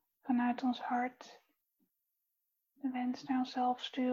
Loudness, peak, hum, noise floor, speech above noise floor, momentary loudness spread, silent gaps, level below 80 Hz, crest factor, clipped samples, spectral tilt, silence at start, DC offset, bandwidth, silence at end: -36 LUFS; -22 dBFS; none; -84 dBFS; 49 dB; 9 LU; none; -82 dBFS; 16 dB; under 0.1%; -4.5 dB/octave; 0.25 s; under 0.1%; 7.2 kHz; 0 s